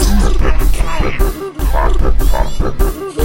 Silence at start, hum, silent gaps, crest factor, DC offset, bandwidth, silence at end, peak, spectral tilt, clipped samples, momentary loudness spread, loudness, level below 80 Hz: 0 s; none; none; 10 dB; 0.6%; 16.5 kHz; 0 s; 0 dBFS; -5.5 dB/octave; under 0.1%; 4 LU; -17 LUFS; -12 dBFS